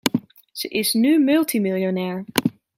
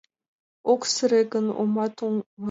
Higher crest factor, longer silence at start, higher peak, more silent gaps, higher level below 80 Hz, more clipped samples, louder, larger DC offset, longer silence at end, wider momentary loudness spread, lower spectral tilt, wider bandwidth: about the same, 20 dB vs 16 dB; second, 0.05 s vs 0.65 s; first, 0 dBFS vs -8 dBFS; second, none vs 2.26-2.37 s; first, -62 dBFS vs -76 dBFS; neither; first, -21 LUFS vs -24 LUFS; neither; first, 0.25 s vs 0 s; first, 11 LU vs 8 LU; about the same, -4.5 dB/octave vs -4 dB/octave; first, 16.5 kHz vs 8 kHz